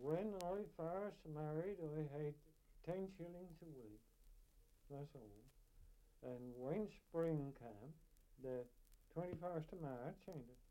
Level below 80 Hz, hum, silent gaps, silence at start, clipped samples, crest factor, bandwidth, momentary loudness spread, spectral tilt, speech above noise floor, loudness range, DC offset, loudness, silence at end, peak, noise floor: -70 dBFS; none; none; 0 s; under 0.1%; 22 dB; 16.5 kHz; 16 LU; -8 dB/octave; 21 dB; 8 LU; under 0.1%; -50 LUFS; 0.05 s; -28 dBFS; -70 dBFS